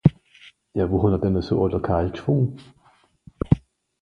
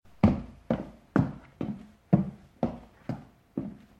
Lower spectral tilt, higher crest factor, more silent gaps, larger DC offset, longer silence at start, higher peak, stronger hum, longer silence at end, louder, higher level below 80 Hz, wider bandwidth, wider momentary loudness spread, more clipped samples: about the same, -10 dB/octave vs -10 dB/octave; about the same, 22 dB vs 22 dB; neither; neither; second, 0.05 s vs 0.25 s; first, -2 dBFS vs -8 dBFS; neither; first, 0.45 s vs 0.2 s; first, -23 LUFS vs -31 LUFS; first, -38 dBFS vs -48 dBFS; about the same, 6.6 kHz vs 7 kHz; second, 8 LU vs 14 LU; neither